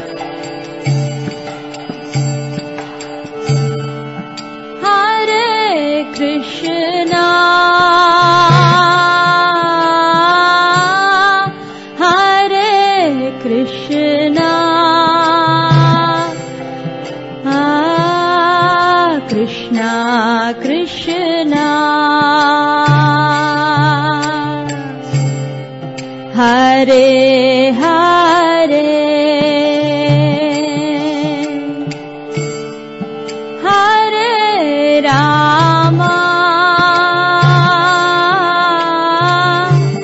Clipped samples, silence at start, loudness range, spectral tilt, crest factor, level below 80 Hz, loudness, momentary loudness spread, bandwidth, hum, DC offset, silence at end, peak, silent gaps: under 0.1%; 0 s; 7 LU; -5.5 dB/octave; 12 dB; -52 dBFS; -11 LUFS; 15 LU; 8 kHz; none; 0.2%; 0 s; 0 dBFS; none